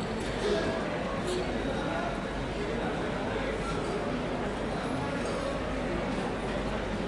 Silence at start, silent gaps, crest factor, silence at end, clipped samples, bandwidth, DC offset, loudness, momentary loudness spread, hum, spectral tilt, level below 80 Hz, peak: 0 s; none; 16 dB; 0 s; under 0.1%; 11.5 kHz; under 0.1%; -32 LUFS; 3 LU; none; -5.5 dB/octave; -42 dBFS; -16 dBFS